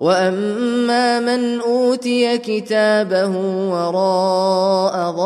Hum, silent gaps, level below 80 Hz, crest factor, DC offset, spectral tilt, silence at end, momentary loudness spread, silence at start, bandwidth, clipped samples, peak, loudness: none; none; -70 dBFS; 14 dB; under 0.1%; -5 dB/octave; 0 s; 4 LU; 0 s; 12.5 kHz; under 0.1%; -2 dBFS; -17 LUFS